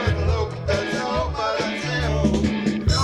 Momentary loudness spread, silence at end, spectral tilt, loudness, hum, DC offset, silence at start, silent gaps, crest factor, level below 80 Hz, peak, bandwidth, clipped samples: 3 LU; 0 s; -5.5 dB/octave; -23 LUFS; none; under 0.1%; 0 s; none; 16 dB; -30 dBFS; -6 dBFS; 11.5 kHz; under 0.1%